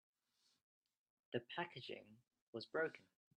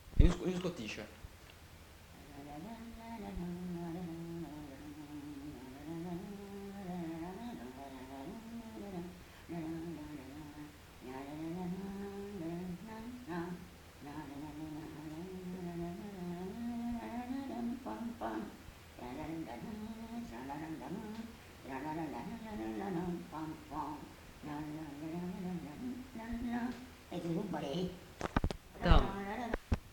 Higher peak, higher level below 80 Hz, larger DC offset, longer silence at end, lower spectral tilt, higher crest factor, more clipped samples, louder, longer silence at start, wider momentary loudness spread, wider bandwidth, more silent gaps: second, -28 dBFS vs -10 dBFS; second, -88 dBFS vs -46 dBFS; neither; first, 0.4 s vs 0 s; about the same, -6 dB/octave vs -6.5 dB/octave; second, 22 dB vs 30 dB; neither; second, -48 LUFS vs -43 LUFS; first, 1.3 s vs 0 s; about the same, 12 LU vs 11 LU; second, 9.8 kHz vs 19 kHz; first, 2.42-2.53 s vs none